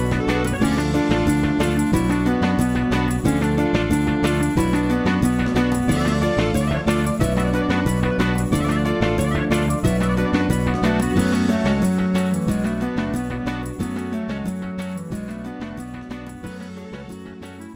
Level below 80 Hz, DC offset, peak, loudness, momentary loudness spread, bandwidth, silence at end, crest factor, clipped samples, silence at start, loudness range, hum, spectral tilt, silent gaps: -32 dBFS; under 0.1%; -2 dBFS; -20 LUFS; 13 LU; 16.5 kHz; 0 s; 18 dB; under 0.1%; 0 s; 9 LU; none; -6.5 dB/octave; none